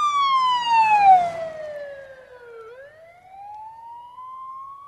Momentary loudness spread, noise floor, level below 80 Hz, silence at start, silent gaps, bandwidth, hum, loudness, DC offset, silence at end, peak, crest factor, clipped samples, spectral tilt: 26 LU; -47 dBFS; -66 dBFS; 0 s; none; 10.5 kHz; none; -18 LUFS; under 0.1%; 0 s; -6 dBFS; 18 dB; under 0.1%; -1.5 dB/octave